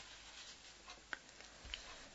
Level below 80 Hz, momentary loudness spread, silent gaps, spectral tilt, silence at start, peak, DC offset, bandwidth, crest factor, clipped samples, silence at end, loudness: -66 dBFS; 6 LU; none; 0 dB/octave; 0 s; -24 dBFS; under 0.1%; 7.6 kHz; 30 dB; under 0.1%; 0 s; -52 LUFS